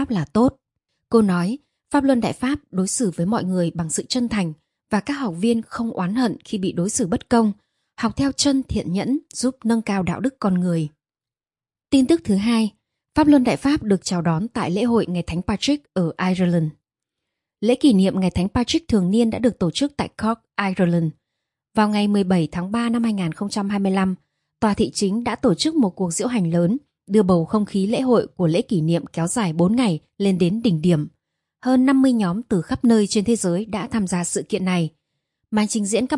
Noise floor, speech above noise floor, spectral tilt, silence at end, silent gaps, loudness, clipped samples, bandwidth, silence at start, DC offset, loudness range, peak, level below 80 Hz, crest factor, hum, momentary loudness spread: under -90 dBFS; over 70 dB; -5.5 dB/octave; 0 s; none; -21 LUFS; under 0.1%; 11.5 kHz; 0 s; under 0.1%; 3 LU; -4 dBFS; -48 dBFS; 16 dB; none; 7 LU